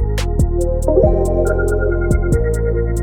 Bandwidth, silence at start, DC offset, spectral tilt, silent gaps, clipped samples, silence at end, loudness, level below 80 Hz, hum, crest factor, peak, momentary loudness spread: 14.5 kHz; 0 s; under 0.1%; -7.5 dB/octave; none; under 0.1%; 0 s; -17 LUFS; -18 dBFS; none; 14 dB; -2 dBFS; 4 LU